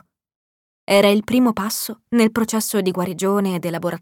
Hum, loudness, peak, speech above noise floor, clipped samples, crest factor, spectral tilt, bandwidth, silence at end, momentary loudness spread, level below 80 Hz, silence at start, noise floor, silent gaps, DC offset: none; -19 LUFS; -4 dBFS; over 72 dB; under 0.1%; 16 dB; -4.5 dB/octave; 18.5 kHz; 0.05 s; 8 LU; -56 dBFS; 0.9 s; under -90 dBFS; none; under 0.1%